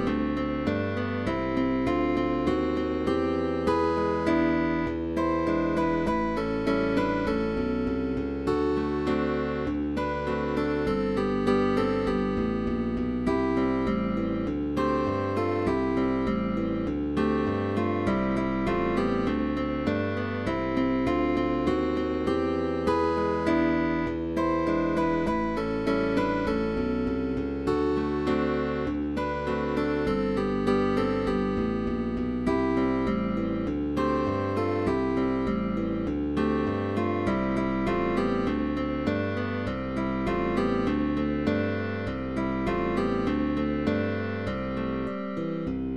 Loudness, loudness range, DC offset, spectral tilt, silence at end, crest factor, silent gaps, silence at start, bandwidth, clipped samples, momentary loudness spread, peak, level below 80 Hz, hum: -27 LUFS; 2 LU; 0.4%; -8 dB/octave; 0 s; 16 dB; none; 0 s; 11.5 kHz; under 0.1%; 4 LU; -10 dBFS; -42 dBFS; none